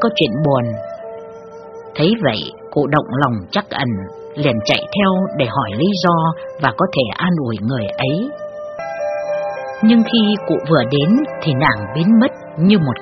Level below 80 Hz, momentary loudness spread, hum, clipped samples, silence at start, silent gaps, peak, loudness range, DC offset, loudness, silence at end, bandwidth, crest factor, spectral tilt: -50 dBFS; 14 LU; none; under 0.1%; 0 s; none; 0 dBFS; 4 LU; under 0.1%; -17 LUFS; 0 s; 6.4 kHz; 16 dB; -5 dB/octave